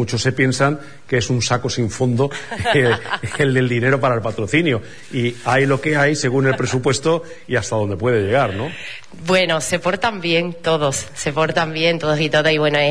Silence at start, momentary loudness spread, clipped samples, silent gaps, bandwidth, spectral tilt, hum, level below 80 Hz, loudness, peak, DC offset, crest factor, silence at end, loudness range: 0 s; 7 LU; under 0.1%; none; 11 kHz; -5 dB/octave; none; -48 dBFS; -18 LUFS; -2 dBFS; 1%; 16 dB; 0 s; 2 LU